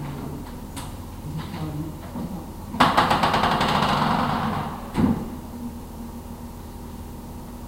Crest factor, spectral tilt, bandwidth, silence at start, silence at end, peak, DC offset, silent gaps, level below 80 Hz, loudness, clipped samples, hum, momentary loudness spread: 24 dB; -5.5 dB/octave; 16 kHz; 0 s; 0 s; -2 dBFS; under 0.1%; none; -40 dBFS; -24 LUFS; under 0.1%; none; 18 LU